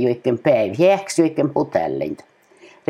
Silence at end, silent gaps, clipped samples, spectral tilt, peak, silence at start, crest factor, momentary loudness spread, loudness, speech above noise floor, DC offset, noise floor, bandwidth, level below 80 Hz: 0.25 s; none; under 0.1%; -6 dB/octave; -2 dBFS; 0 s; 16 dB; 10 LU; -19 LUFS; 30 dB; under 0.1%; -49 dBFS; 13.5 kHz; -62 dBFS